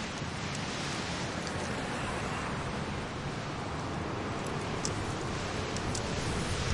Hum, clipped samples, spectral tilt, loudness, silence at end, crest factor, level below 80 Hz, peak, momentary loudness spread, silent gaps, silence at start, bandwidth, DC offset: none; under 0.1%; -4.5 dB/octave; -35 LUFS; 0 s; 18 dB; -48 dBFS; -18 dBFS; 3 LU; none; 0 s; 11.5 kHz; under 0.1%